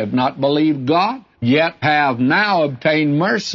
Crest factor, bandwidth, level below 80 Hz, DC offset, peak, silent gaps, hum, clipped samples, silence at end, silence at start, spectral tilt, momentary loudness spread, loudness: 12 dB; 7.4 kHz; -60 dBFS; under 0.1%; -4 dBFS; none; none; under 0.1%; 0 s; 0 s; -6 dB/octave; 3 LU; -16 LUFS